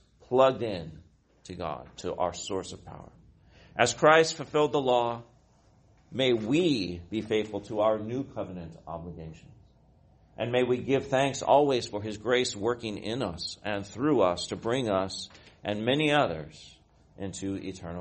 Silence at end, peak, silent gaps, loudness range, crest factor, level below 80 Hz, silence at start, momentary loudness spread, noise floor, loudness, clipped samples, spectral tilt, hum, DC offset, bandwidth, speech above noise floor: 0 s; -6 dBFS; none; 6 LU; 24 dB; -58 dBFS; 0.3 s; 17 LU; -61 dBFS; -28 LUFS; under 0.1%; -4.5 dB/octave; none; under 0.1%; 8.8 kHz; 33 dB